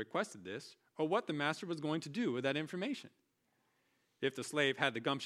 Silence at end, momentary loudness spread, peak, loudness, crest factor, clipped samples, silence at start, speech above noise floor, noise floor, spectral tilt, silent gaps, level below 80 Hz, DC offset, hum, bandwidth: 0 s; 12 LU; -16 dBFS; -38 LUFS; 24 dB; under 0.1%; 0 s; 42 dB; -79 dBFS; -4.5 dB/octave; none; -86 dBFS; under 0.1%; none; 14.5 kHz